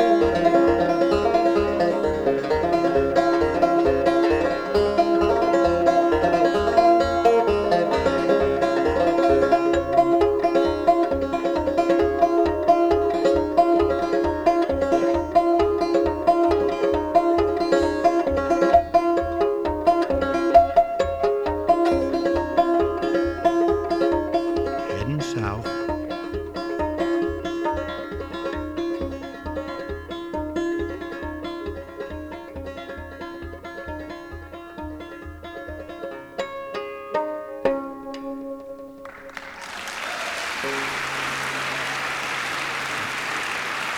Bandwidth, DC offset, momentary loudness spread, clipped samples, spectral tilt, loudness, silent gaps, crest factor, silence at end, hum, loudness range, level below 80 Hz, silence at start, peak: 14.5 kHz; under 0.1%; 16 LU; under 0.1%; -5.5 dB/octave; -21 LUFS; none; 18 dB; 0 s; none; 12 LU; -42 dBFS; 0 s; -4 dBFS